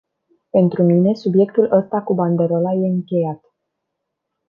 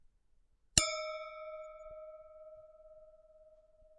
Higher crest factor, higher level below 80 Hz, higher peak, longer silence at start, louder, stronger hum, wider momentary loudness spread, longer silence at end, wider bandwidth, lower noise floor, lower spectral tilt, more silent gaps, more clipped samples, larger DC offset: second, 16 dB vs 36 dB; second, -66 dBFS vs -58 dBFS; first, -2 dBFS vs -6 dBFS; second, 0.55 s vs 0.75 s; first, -17 LUFS vs -34 LUFS; neither; second, 7 LU vs 26 LU; first, 1.15 s vs 0.05 s; second, 5.6 kHz vs 9 kHz; first, -77 dBFS vs -70 dBFS; first, -11 dB/octave vs -1.5 dB/octave; neither; neither; neither